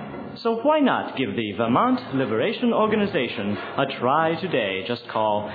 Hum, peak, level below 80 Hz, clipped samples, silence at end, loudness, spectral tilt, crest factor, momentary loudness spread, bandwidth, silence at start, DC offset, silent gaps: none; -6 dBFS; -62 dBFS; under 0.1%; 0 s; -23 LUFS; -8.5 dB/octave; 16 dB; 7 LU; 4.9 kHz; 0 s; under 0.1%; none